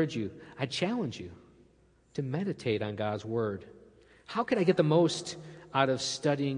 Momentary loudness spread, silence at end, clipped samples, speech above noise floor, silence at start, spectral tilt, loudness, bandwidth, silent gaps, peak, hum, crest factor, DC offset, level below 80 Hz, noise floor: 15 LU; 0 s; under 0.1%; 34 dB; 0 s; -5.5 dB/octave; -31 LUFS; 10.5 kHz; none; -10 dBFS; none; 22 dB; under 0.1%; -68 dBFS; -64 dBFS